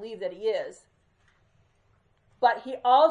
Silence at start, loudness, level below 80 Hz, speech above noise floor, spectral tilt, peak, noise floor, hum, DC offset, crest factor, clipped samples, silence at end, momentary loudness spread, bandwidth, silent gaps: 0 s; -26 LUFS; -74 dBFS; 42 dB; -4 dB/octave; -8 dBFS; -66 dBFS; none; under 0.1%; 18 dB; under 0.1%; 0 s; 13 LU; 9.8 kHz; none